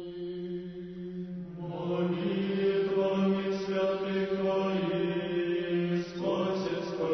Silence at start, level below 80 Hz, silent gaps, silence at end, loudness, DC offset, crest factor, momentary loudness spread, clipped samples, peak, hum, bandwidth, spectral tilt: 0 s; -64 dBFS; none; 0 s; -31 LUFS; under 0.1%; 12 dB; 11 LU; under 0.1%; -18 dBFS; none; 6.4 kHz; -7.5 dB/octave